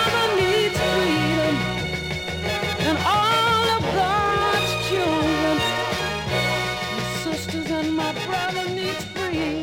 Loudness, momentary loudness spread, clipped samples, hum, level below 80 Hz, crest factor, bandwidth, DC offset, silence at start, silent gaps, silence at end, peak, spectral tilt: -22 LUFS; 7 LU; under 0.1%; none; -42 dBFS; 14 dB; 17.5 kHz; under 0.1%; 0 s; none; 0 s; -10 dBFS; -4.5 dB/octave